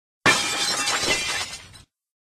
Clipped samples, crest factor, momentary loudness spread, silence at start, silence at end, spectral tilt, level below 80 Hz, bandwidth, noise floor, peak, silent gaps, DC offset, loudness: under 0.1%; 20 dB; 11 LU; 0.25 s; 0.5 s; -1 dB/octave; -54 dBFS; 13 kHz; -50 dBFS; -4 dBFS; none; under 0.1%; -21 LUFS